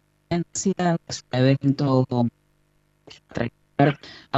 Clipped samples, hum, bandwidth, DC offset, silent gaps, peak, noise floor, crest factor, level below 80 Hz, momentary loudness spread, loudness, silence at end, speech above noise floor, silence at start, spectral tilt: under 0.1%; 50 Hz at -50 dBFS; 8.4 kHz; under 0.1%; none; -6 dBFS; -65 dBFS; 18 dB; -56 dBFS; 10 LU; -23 LUFS; 0 s; 42 dB; 0.3 s; -6 dB/octave